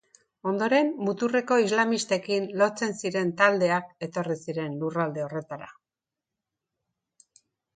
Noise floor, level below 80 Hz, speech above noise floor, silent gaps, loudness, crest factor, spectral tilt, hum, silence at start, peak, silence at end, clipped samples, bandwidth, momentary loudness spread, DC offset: -90 dBFS; -74 dBFS; 64 dB; none; -26 LUFS; 22 dB; -5 dB/octave; none; 0.45 s; -4 dBFS; 2.05 s; under 0.1%; 9.6 kHz; 12 LU; under 0.1%